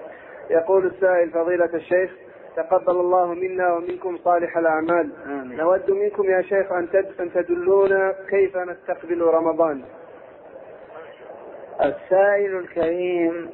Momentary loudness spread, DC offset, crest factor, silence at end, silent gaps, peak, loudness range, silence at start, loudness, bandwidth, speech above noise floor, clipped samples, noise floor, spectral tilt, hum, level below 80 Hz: 19 LU; under 0.1%; 14 dB; 0 s; none; -6 dBFS; 4 LU; 0 s; -21 LUFS; 4.1 kHz; 22 dB; under 0.1%; -43 dBFS; -10 dB/octave; none; -62 dBFS